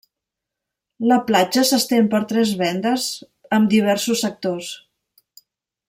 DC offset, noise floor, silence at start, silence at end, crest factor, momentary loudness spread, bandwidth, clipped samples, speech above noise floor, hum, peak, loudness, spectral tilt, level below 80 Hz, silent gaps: under 0.1%; -84 dBFS; 1 s; 1.1 s; 16 dB; 10 LU; 16.5 kHz; under 0.1%; 66 dB; none; -4 dBFS; -19 LUFS; -4 dB/octave; -66 dBFS; none